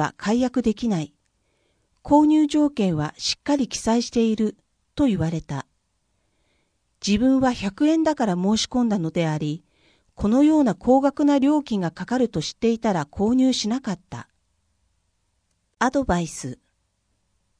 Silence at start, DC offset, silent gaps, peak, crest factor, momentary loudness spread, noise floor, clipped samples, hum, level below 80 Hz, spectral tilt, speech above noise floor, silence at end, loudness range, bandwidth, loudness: 0 s; under 0.1%; none; -4 dBFS; 18 dB; 12 LU; -71 dBFS; under 0.1%; none; -48 dBFS; -5.5 dB/octave; 50 dB; 1.05 s; 5 LU; 10.5 kHz; -22 LUFS